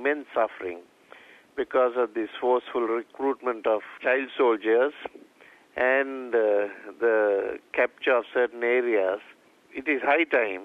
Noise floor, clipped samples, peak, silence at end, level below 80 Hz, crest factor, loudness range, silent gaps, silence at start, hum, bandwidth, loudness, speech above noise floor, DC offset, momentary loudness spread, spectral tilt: -55 dBFS; under 0.1%; -8 dBFS; 0 s; -70 dBFS; 18 dB; 3 LU; none; 0 s; none; 5 kHz; -25 LUFS; 30 dB; under 0.1%; 11 LU; -5 dB/octave